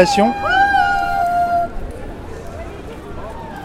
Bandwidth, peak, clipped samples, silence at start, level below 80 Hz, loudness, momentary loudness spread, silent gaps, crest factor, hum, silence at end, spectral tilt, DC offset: 15.5 kHz; 0 dBFS; under 0.1%; 0 s; -34 dBFS; -16 LUFS; 18 LU; none; 18 dB; none; 0 s; -4.5 dB/octave; under 0.1%